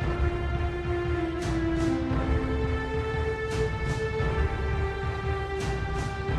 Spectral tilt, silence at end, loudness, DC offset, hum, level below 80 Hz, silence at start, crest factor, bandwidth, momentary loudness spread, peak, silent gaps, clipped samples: -7 dB/octave; 0 s; -29 LUFS; under 0.1%; none; -34 dBFS; 0 s; 14 dB; 11 kHz; 3 LU; -14 dBFS; none; under 0.1%